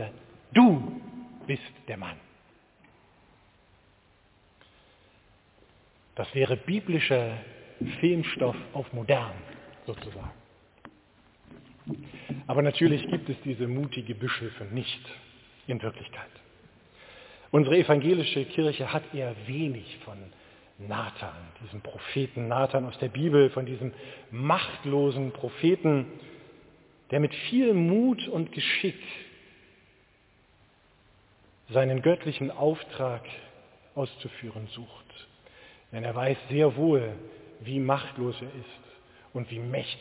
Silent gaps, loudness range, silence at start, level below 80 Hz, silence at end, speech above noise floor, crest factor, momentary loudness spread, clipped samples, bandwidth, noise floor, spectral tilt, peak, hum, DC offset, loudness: none; 9 LU; 0 s; -62 dBFS; 0 s; 35 dB; 22 dB; 21 LU; under 0.1%; 4 kHz; -63 dBFS; -5.5 dB/octave; -6 dBFS; none; under 0.1%; -28 LUFS